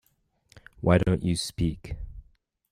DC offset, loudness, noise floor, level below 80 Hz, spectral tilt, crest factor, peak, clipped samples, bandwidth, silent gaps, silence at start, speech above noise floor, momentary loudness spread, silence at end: under 0.1%; -26 LUFS; -70 dBFS; -42 dBFS; -6 dB/octave; 20 dB; -8 dBFS; under 0.1%; 15.5 kHz; none; 0.8 s; 45 dB; 18 LU; 0.5 s